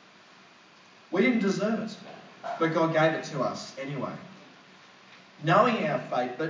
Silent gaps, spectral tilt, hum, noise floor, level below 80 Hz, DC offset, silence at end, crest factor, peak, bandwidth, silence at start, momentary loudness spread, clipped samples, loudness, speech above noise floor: none; -6 dB/octave; none; -55 dBFS; -84 dBFS; under 0.1%; 0 s; 22 dB; -8 dBFS; 7.6 kHz; 1.1 s; 17 LU; under 0.1%; -27 LUFS; 28 dB